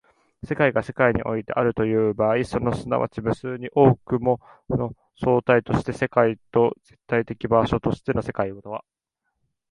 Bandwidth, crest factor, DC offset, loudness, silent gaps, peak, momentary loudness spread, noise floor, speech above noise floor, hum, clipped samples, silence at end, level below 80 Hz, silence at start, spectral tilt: 11 kHz; 20 dB; under 0.1%; -23 LUFS; none; -2 dBFS; 10 LU; -78 dBFS; 56 dB; none; under 0.1%; 0.95 s; -46 dBFS; 0.45 s; -8 dB/octave